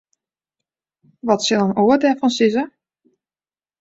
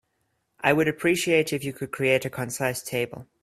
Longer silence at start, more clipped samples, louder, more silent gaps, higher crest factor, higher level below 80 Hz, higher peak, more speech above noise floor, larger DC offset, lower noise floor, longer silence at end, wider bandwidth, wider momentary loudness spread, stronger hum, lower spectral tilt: first, 1.25 s vs 0.6 s; neither; first, -17 LUFS vs -25 LUFS; neither; about the same, 18 dB vs 22 dB; about the same, -62 dBFS vs -62 dBFS; about the same, -2 dBFS vs -4 dBFS; first, over 74 dB vs 49 dB; neither; first, under -90 dBFS vs -74 dBFS; first, 1.15 s vs 0.2 s; second, 8 kHz vs 16 kHz; about the same, 10 LU vs 9 LU; neither; about the same, -4.5 dB/octave vs -4.5 dB/octave